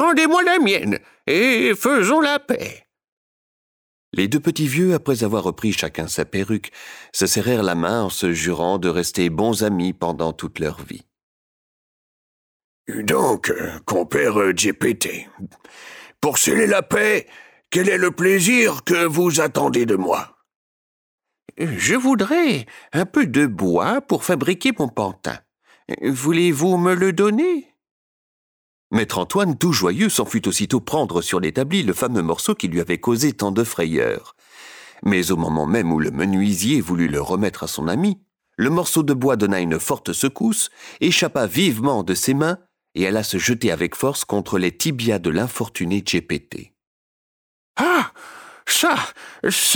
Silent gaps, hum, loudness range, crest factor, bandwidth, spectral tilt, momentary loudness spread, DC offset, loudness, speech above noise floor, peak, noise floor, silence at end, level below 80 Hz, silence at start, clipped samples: 3.12-4.12 s, 11.23-12.85 s, 20.56-21.18 s, 27.91-28.90 s, 46.87-47.75 s; none; 5 LU; 14 dB; over 20 kHz; -4 dB/octave; 10 LU; under 0.1%; -19 LUFS; 23 dB; -6 dBFS; -43 dBFS; 0 s; -52 dBFS; 0 s; under 0.1%